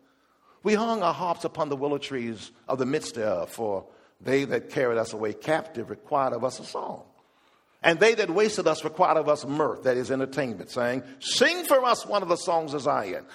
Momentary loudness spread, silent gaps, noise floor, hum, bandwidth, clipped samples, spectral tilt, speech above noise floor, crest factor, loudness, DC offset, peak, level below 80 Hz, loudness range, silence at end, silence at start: 11 LU; none; -63 dBFS; none; 15.5 kHz; under 0.1%; -4 dB/octave; 37 dB; 24 dB; -26 LUFS; under 0.1%; -2 dBFS; -70 dBFS; 5 LU; 0 s; 0.65 s